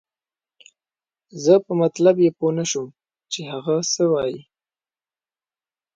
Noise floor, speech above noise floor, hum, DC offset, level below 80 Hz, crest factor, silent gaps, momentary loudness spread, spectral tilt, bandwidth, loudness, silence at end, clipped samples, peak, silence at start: under -90 dBFS; over 71 dB; none; under 0.1%; -66 dBFS; 20 dB; none; 14 LU; -5 dB/octave; 9.2 kHz; -20 LUFS; 1.55 s; under 0.1%; -2 dBFS; 1.35 s